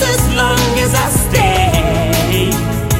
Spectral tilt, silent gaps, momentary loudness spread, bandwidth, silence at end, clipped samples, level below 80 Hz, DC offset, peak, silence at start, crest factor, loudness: -4.5 dB/octave; none; 2 LU; 16.5 kHz; 0 s; under 0.1%; -22 dBFS; under 0.1%; -2 dBFS; 0 s; 12 dB; -13 LUFS